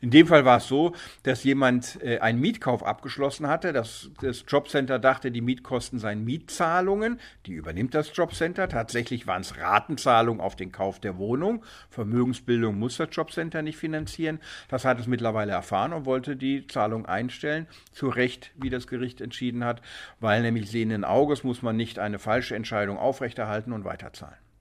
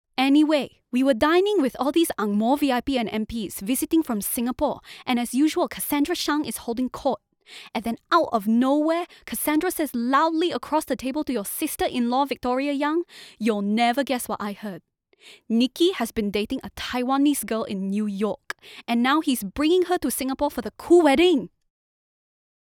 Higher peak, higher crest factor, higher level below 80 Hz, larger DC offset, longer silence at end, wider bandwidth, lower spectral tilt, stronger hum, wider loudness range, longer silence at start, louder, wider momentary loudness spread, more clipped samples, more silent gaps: first, -2 dBFS vs -6 dBFS; first, 24 dB vs 18 dB; about the same, -54 dBFS vs -54 dBFS; neither; second, 0.3 s vs 1.2 s; second, 15 kHz vs over 20 kHz; first, -6 dB/octave vs -4 dB/octave; neither; about the same, 3 LU vs 4 LU; second, 0 s vs 0.2 s; second, -26 LUFS vs -23 LUFS; about the same, 10 LU vs 10 LU; neither; neither